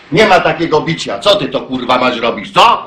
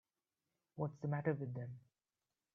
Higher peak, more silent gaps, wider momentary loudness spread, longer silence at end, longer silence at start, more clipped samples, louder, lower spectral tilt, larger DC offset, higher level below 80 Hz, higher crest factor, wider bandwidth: first, 0 dBFS vs -22 dBFS; neither; second, 8 LU vs 17 LU; second, 0 s vs 0.75 s; second, 0.1 s vs 0.75 s; neither; first, -12 LUFS vs -43 LUFS; second, -4.5 dB/octave vs -10 dB/octave; neither; first, -44 dBFS vs -80 dBFS; second, 12 dB vs 22 dB; first, 16.5 kHz vs 6.2 kHz